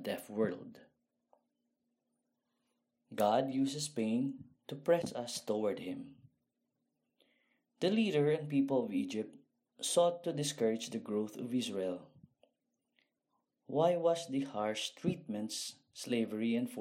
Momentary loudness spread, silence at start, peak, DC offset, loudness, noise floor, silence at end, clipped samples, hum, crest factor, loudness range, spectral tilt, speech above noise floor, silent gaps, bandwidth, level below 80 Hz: 13 LU; 0 s; -18 dBFS; under 0.1%; -35 LUFS; -84 dBFS; 0 s; under 0.1%; none; 20 dB; 5 LU; -5 dB/octave; 50 dB; none; 16 kHz; -82 dBFS